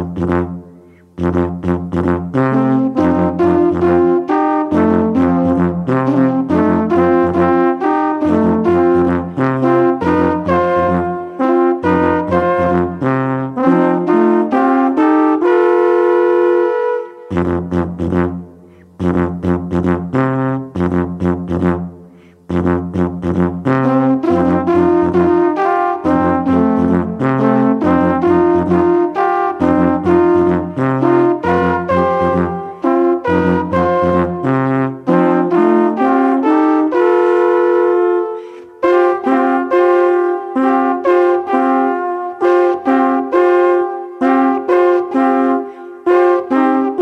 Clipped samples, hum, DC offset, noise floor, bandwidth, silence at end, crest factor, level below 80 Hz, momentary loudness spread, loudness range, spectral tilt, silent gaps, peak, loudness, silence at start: under 0.1%; none; under 0.1%; -41 dBFS; 6.2 kHz; 0 s; 12 dB; -42 dBFS; 6 LU; 4 LU; -9 dB/octave; none; 0 dBFS; -14 LUFS; 0 s